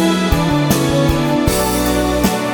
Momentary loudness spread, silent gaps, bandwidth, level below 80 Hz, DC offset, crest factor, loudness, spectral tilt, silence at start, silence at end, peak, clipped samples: 1 LU; none; over 20 kHz; -26 dBFS; under 0.1%; 12 dB; -15 LUFS; -5 dB/octave; 0 s; 0 s; -2 dBFS; under 0.1%